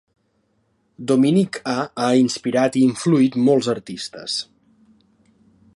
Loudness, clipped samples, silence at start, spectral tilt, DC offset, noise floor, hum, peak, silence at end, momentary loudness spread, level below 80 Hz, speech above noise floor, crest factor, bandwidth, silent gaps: -19 LUFS; under 0.1%; 1 s; -5.5 dB/octave; under 0.1%; -66 dBFS; none; -4 dBFS; 1.35 s; 11 LU; -66 dBFS; 48 dB; 16 dB; 11.5 kHz; none